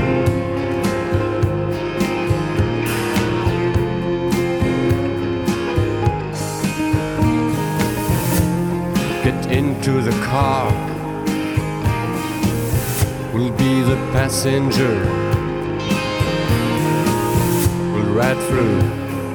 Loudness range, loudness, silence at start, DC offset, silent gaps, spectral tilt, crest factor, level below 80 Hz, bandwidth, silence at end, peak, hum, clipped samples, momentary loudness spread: 2 LU; -19 LUFS; 0 s; under 0.1%; none; -6 dB/octave; 16 dB; -34 dBFS; 19 kHz; 0 s; -2 dBFS; none; under 0.1%; 4 LU